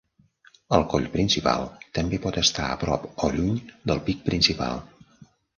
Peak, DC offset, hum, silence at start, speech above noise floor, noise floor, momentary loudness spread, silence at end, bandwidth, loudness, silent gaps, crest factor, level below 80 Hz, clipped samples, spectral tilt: -2 dBFS; under 0.1%; none; 0.7 s; 34 dB; -59 dBFS; 8 LU; 0.35 s; 10.5 kHz; -24 LUFS; none; 24 dB; -42 dBFS; under 0.1%; -4.5 dB/octave